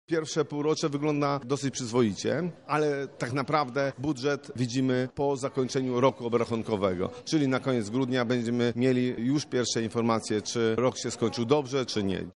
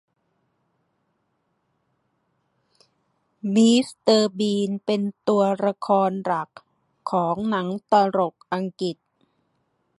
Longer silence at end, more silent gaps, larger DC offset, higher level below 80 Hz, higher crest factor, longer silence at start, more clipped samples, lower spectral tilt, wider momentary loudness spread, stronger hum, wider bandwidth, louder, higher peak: second, 0.05 s vs 1.05 s; neither; neither; about the same, -66 dBFS vs -70 dBFS; about the same, 20 dB vs 20 dB; second, 0.1 s vs 3.45 s; neither; about the same, -5.5 dB/octave vs -5.5 dB/octave; second, 4 LU vs 11 LU; neither; about the same, 11.5 kHz vs 11.5 kHz; second, -28 LUFS vs -22 LUFS; second, -8 dBFS vs -4 dBFS